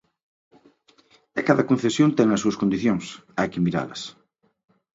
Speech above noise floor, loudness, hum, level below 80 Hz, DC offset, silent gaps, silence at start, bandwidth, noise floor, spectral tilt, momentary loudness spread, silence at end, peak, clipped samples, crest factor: 37 dB; -23 LUFS; none; -58 dBFS; under 0.1%; none; 1.35 s; 8 kHz; -59 dBFS; -6 dB/octave; 13 LU; 0.85 s; -2 dBFS; under 0.1%; 22 dB